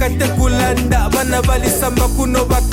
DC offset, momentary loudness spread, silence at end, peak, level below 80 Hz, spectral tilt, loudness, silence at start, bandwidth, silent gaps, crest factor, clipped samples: under 0.1%; 1 LU; 0 s; -2 dBFS; -18 dBFS; -5 dB/octave; -15 LUFS; 0 s; 17 kHz; none; 12 dB; under 0.1%